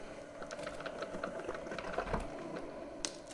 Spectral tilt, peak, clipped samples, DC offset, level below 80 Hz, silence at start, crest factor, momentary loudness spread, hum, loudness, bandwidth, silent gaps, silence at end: -3.5 dB/octave; -14 dBFS; under 0.1%; under 0.1%; -54 dBFS; 0 s; 28 dB; 7 LU; none; -43 LUFS; 11.5 kHz; none; 0 s